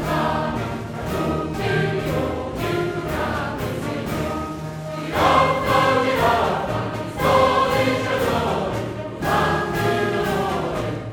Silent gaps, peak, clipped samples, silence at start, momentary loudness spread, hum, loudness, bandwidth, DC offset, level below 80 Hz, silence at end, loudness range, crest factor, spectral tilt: none; -4 dBFS; under 0.1%; 0 s; 10 LU; none; -21 LUFS; 19 kHz; under 0.1%; -40 dBFS; 0 s; 5 LU; 16 dB; -5.5 dB/octave